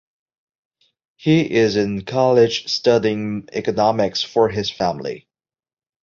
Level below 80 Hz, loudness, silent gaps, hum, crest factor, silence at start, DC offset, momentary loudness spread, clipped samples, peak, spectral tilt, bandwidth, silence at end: -54 dBFS; -18 LUFS; none; none; 18 dB; 1.2 s; under 0.1%; 9 LU; under 0.1%; -2 dBFS; -5.5 dB/octave; 7.6 kHz; 0.85 s